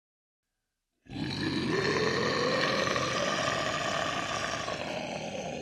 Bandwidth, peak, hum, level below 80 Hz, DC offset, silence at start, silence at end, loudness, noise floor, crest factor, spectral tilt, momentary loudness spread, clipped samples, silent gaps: 14 kHz; -10 dBFS; none; -60 dBFS; under 0.1%; 1.1 s; 0 s; -30 LUFS; -85 dBFS; 20 dB; -3.5 dB/octave; 9 LU; under 0.1%; none